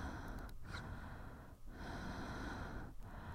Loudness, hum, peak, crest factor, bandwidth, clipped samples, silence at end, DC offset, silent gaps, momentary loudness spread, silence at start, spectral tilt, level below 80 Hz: -50 LUFS; none; -34 dBFS; 14 dB; 16 kHz; under 0.1%; 0 s; under 0.1%; none; 7 LU; 0 s; -6 dB/octave; -52 dBFS